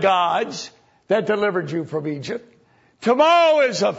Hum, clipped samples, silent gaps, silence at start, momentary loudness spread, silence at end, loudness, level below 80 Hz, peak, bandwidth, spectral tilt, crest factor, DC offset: none; under 0.1%; none; 0 s; 16 LU; 0 s; -19 LUFS; -68 dBFS; -4 dBFS; 8 kHz; -4.5 dB/octave; 16 dB; under 0.1%